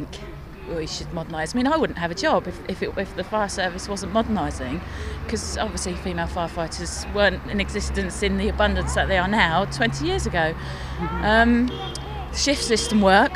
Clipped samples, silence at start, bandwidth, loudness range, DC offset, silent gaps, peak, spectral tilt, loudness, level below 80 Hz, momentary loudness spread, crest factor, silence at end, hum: under 0.1%; 0 s; 15.5 kHz; 5 LU; under 0.1%; none; 0 dBFS; -4.5 dB/octave; -23 LUFS; -34 dBFS; 12 LU; 22 dB; 0 s; none